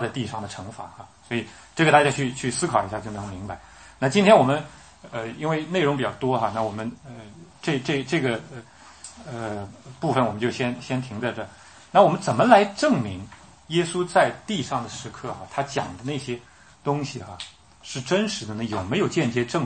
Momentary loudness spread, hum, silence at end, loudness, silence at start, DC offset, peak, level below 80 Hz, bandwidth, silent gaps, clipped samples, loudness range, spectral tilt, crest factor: 21 LU; none; 0 s; -24 LUFS; 0 s; under 0.1%; 0 dBFS; -58 dBFS; 8.8 kHz; none; under 0.1%; 8 LU; -5 dB/octave; 24 dB